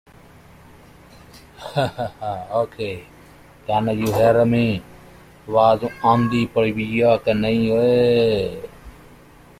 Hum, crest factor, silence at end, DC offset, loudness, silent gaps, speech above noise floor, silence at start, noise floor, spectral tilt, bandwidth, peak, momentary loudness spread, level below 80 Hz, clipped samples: 60 Hz at -50 dBFS; 18 dB; 0.7 s; under 0.1%; -19 LUFS; none; 28 dB; 1.35 s; -47 dBFS; -7 dB/octave; 15.5 kHz; -4 dBFS; 13 LU; -48 dBFS; under 0.1%